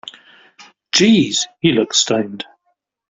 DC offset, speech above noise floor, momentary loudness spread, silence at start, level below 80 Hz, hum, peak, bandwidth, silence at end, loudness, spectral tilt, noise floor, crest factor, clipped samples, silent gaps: under 0.1%; 53 dB; 20 LU; 0.05 s; -56 dBFS; none; 0 dBFS; 8.2 kHz; 0.65 s; -15 LUFS; -3.5 dB/octave; -68 dBFS; 18 dB; under 0.1%; none